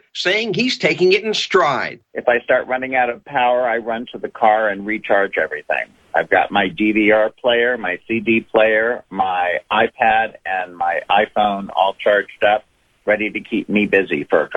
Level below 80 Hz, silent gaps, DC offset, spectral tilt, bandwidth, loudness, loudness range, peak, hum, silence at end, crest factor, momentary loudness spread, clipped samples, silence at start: -56 dBFS; none; under 0.1%; -4.5 dB/octave; 8.4 kHz; -17 LUFS; 2 LU; 0 dBFS; none; 0 s; 16 dB; 7 LU; under 0.1%; 0.15 s